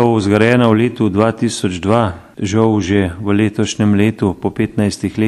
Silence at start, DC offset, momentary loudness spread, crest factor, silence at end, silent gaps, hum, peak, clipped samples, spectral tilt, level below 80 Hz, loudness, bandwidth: 0 s; under 0.1%; 7 LU; 14 dB; 0 s; none; none; 0 dBFS; under 0.1%; -6.5 dB/octave; -44 dBFS; -15 LUFS; 12 kHz